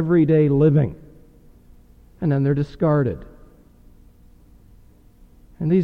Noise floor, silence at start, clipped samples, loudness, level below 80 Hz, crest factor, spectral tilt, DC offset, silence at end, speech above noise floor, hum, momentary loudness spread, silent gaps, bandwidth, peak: -50 dBFS; 0 s; under 0.1%; -19 LUFS; -46 dBFS; 16 dB; -11 dB/octave; under 0.1%; 0 s; 32 dB; none; 11 LU; none; 4.8 kHz; -6 dBFS